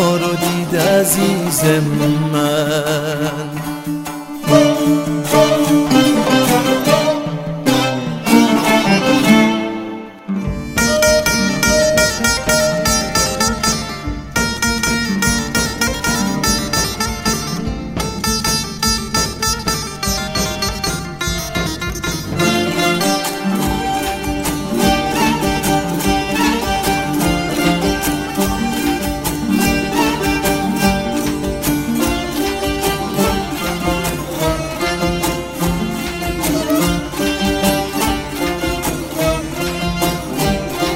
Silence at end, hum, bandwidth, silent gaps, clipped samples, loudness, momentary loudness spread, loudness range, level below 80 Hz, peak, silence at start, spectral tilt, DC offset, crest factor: 0 s; none; 16.5 kHz; none; under 0.1%; -16 LUFS; 8 LU; 4 LU; -32 dBFS; 0 dBFS; 0 s; -4 dB/octave; under 0.1%; 16 dB